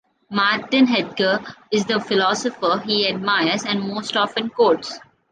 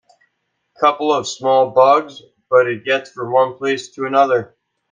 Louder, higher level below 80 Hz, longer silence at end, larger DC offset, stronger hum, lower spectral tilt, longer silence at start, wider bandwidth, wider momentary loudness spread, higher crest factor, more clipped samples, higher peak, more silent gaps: second, -20 LUFS vs -16 LUFS; about the same, -66 dBFS vs -68 dBFS; about the same, 0.35 s vs 0.45 s; neither; neither; about the same, -4 dB/octave vs -4 dB/octave; second, 0.3 s vs 0.8 s; about the same, 9.8 kHz vs 9.4 kHz; about the same, 6 LU vs 8 LU; about the same, 16 dB vs 16 dB; neither; second, -4 dBFS vs 0 dBFS; neither